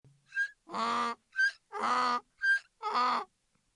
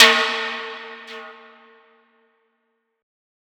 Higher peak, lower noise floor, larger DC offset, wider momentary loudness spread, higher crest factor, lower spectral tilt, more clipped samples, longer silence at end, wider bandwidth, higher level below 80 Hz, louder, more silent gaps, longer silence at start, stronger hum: second, -18 dBFS vs 0 dBFS; about the same, -73 dBFS vs -72 dBFS; neither; second, 7 LU vs 21 LU; second, 14 dB vs 24 dB; first, -1.5 dB/octave vs 0.5 dB/octave; neither; second, 0.5 s vs 2.15 s; second, 11 kHz vs over 20 kHz; second, -84 dBFS vs -78 dBFS; second, -32 LUFS vs -19 LUFS; neither; first, 0.3 s vs 0 s; neither